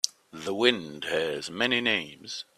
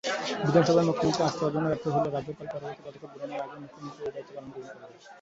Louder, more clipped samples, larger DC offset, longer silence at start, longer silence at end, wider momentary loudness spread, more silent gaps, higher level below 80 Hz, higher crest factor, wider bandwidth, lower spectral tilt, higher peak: about the same, -27 LUFS vs -28 LUFS; neither; neither; about the same, 0.05 s vs 0.05 s; first, 0.15 s vs 0 s; second, 13 LU vs 20 LU; neither; second, -68 dBFS vs -62 dBFS; first, 28 dB vs 22 dB; first, 14.5 kHz vs 8 kHz; second, -2.5 dB/octave vs -6 dB/octave; first, -2 dBFS vs -8 dBFS